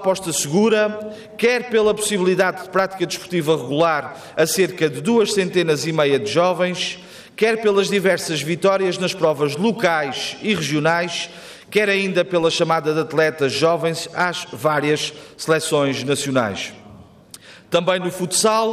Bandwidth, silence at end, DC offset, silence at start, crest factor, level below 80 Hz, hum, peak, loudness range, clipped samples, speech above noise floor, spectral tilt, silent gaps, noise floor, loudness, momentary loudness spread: 15.5 kHz; 0 s; under 0.1%; 0 s; 14 dB; -60 dBFS; none; -6 dBFS; 2 LU; under 0.1%; 25 dB; -4 dB/octave; none; -44 dBFS; -19 LUFS; 7 LU